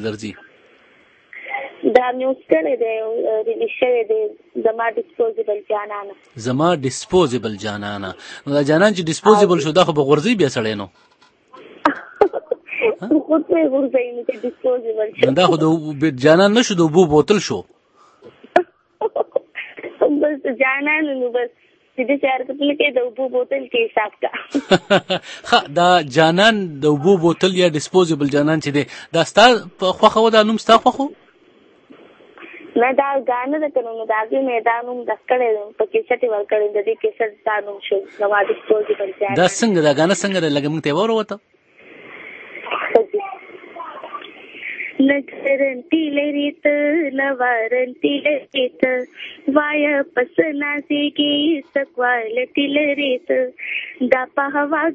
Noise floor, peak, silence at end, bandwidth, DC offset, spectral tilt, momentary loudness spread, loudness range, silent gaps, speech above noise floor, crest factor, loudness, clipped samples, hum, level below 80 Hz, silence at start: -52 dBFS; 0 dBFS; 0 s; 8.8 kHz; under 0.1%; -5 dB/octave; 12 LU; 6 LU; none; 35 dB; 18 dB; -18 LUFS; under 0.1%; none; -58 dBFS; 0 s